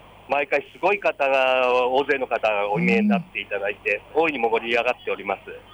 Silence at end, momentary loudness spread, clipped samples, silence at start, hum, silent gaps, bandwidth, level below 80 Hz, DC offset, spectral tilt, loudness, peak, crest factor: 0.15 s; 8 LU; under 0.1%; 0.3 s; none; none; over 20 kHz; -58 dBFS; under 0.1%; -6.5 dB/octave; -22 LUFS; -10 dBFS; 14 dB